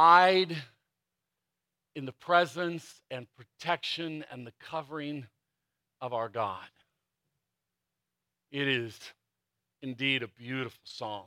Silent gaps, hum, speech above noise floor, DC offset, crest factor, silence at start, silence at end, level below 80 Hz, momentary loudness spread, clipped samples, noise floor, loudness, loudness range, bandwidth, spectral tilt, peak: none; none; 57 dB; under 0.1%; 24 dB; 0 s; 0.05 s; -82 dBFS; 17 LU; under 0.1%; -87 dBFS; -30 LUFS; 7 LU; 16 kHz; -5 dB/octave; -8 dBFS